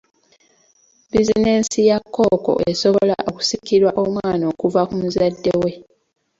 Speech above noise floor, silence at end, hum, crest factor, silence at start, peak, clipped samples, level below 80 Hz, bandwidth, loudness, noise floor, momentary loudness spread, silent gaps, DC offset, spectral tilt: 40 dB; 0.55 s; none; 16 dB; 1.15 s; -2 dBFS; under 0.1%; -48 dBFS; 8 kHz; -18 LUFS; -57 dBFS; 5 LU; none; under 0.1%; -5 dB/octave